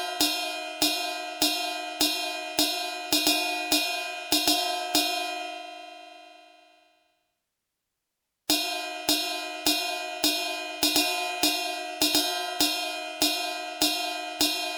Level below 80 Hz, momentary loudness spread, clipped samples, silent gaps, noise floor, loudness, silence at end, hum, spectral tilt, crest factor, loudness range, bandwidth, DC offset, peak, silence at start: -64 dBFS; 9 LU; under 0.1%; none; -83 dBFS; -25 LUFS; 0 s; none; 0 dB/octave; 22 dB; 8 LU; over 20 kHz; under 0.1%; -8 dBFS; 0 s